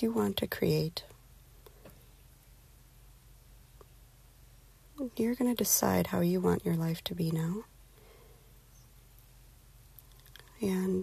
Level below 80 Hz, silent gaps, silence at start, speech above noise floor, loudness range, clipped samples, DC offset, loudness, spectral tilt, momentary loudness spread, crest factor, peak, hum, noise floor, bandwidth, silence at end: -58 dBFS; none; 0 s; 27 dB; 13 LU; under 0.1%; under 0.1%; -31 LUFS; -5 dB/octave; 27 LU; 22 dB; -12 dBFS; none; -58 dBFS; 14.5 kHz; 0 s